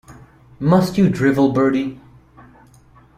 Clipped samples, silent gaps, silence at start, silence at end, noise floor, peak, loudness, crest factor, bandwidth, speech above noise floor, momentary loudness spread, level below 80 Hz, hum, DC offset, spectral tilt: under 0.1%; none; 0.1 s; 1.2 s; -49 dBFS; -2 dBFS; -17 LUFS; 16 dB; 15 kHz; 33 dB; 8 LU; -50 dBFS; none; under 0.1%; -7.5 dB/octave